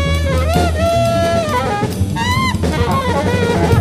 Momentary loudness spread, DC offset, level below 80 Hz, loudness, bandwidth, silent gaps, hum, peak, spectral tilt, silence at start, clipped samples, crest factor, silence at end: 3 LU; under 0.1%; -24 dBFS; -15 LUFS; 15.5 kHz; none; none; -2 dBFS; -6 dB/octave; 0 s; under 0.1%; 12 dB; 0 s